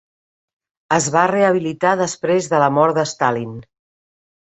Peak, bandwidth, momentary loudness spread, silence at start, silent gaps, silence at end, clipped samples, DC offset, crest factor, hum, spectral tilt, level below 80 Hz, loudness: -2 dBFS; 8.2 kHz; 6 LU; 0.9 s; none; 0.85 s; under 0.1%; under 0.1%; 18 dB; none; -4.5 dB/octave; -60 dBFS; -17 LUFS